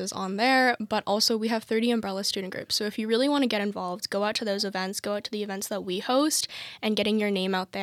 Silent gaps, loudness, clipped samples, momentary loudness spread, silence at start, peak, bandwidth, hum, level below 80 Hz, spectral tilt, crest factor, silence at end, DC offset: none; -26 LUFS; under 0.1%; 8 LU; 0 s; -10 dBFS; 16.5 kHz; none; -72 dBFS; -3 dB/octave; 18 dB; 0 s; under 0.1%